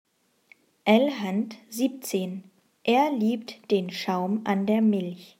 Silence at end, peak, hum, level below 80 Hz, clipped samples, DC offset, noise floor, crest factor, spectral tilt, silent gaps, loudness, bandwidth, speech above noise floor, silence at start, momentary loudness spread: 0.15 s; -6 dBFS; none; -78 dBFS; under 0.1%; under 0.1%; -60 dBFS; 20 dB; -5.5 dB/octave; none; -26 LUFS; 16 kHz; 35 dB; 0.85 s; 10 LU